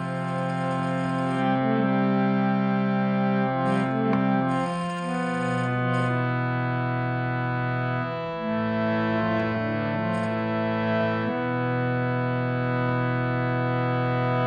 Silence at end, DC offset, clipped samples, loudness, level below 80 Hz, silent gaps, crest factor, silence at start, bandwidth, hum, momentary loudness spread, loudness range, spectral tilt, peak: 0 s; under 0.1%; under 0.1%; -25 LUFS; -56 dBFS; none; 12 dB; 0 s; 9.4 kHz; none; 4 LU; 3 LU; -8 dB/octave; -12 dBFS